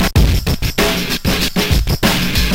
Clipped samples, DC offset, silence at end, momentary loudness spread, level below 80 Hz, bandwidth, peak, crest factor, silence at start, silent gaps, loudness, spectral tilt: under 0.1%; 2%; 0 s; 3 LU; -20 dBFS; 17 kHz; -2 dBFS; 14 dB; 0 s; none; -15 LUFS; -4.5 dB/octave